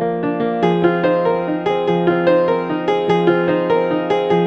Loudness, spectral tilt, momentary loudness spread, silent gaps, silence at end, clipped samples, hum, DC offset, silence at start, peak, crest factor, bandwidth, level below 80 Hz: -17 LUFS; -8 dB/octave; 4 LU; none; 0 s; under 0.1%; none; under 0.1%; 0 s; -2 dBFS; 14 dB; 6.4 kHz; -58 dBFS